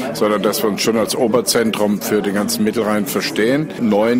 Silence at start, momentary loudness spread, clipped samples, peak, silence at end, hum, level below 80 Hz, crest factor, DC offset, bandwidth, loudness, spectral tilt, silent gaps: 0 s; 3 LU; under 0.1%; -4 dBFS; 0 s; none; -54 dBFS; 14 dB; under 0.1%; 16 kHz; -17 LUFS; -4 dB/octave; none